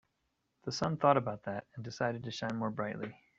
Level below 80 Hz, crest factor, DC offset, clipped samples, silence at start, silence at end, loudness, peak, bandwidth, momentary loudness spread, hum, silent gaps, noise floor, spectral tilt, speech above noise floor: -70 dBFS; 24 dB; under 0.1%; under 0.1%; 0.65 s; 0.25 s; -35 LUFS; -12 dBFS; 8 kHz; 14 LU; none; none; -81 dBFS; -6 dB/octave; 47 dB